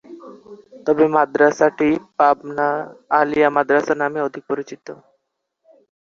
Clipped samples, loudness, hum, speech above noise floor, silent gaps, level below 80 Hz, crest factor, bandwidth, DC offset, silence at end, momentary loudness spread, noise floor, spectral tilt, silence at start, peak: under 0.1%; -18 LUFS; none; 55 dB; none; -62 dBFS; 18 dB; 7.2 kHz; under 0.1%; 1.15 s; 15 LU; -73 dBFS; -6 dB/octave; 0.1 s; -2 dBFS